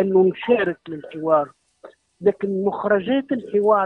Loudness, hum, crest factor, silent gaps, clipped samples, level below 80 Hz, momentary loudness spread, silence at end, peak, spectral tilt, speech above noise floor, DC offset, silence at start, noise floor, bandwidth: -21 LUFS; none; 16 dB; none; under 0.1%; -64 dBFS; 10 LU; 0 s; -6 dBFS; -8.5 dB/octave; 28 dB; under 0.1%; 0 s; -48 dBFS; 4.1 kHz